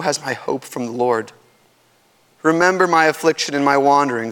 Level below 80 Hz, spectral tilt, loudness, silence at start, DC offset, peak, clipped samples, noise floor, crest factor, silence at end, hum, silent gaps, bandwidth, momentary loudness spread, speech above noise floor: -66 dBFS; -4 dB/octave; -17 LUFS; 0 s; under 0.1%; 0 dBFS; under 0.1%; -57 dBFS; 18 dB; 0 s; none; none; 19 kHz; 11 LU; 40 dB